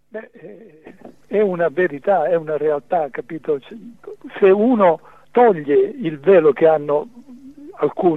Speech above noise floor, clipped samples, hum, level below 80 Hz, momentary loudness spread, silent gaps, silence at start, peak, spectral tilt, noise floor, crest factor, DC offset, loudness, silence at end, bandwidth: 23 dB; under 0.1%; none; -66 dBFS; 21 LU; none; 0.15 s; -2 dBFS; -9 dB/octave; -40 dBFS; 16 dB; 0.3%; -17 LUFS; 0 s; 4 kHz